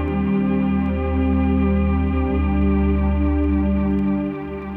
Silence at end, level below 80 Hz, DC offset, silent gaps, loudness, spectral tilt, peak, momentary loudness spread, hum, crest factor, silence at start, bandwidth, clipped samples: 0 s; -24 dBFS; under 0.1%; none; -20 LUFS; -11 dB/octave; -8 dBFS; 3 LU; 50 Hz at -60 dBFS; 10 dB; 0 s; 3.8 kHz; under 0.1%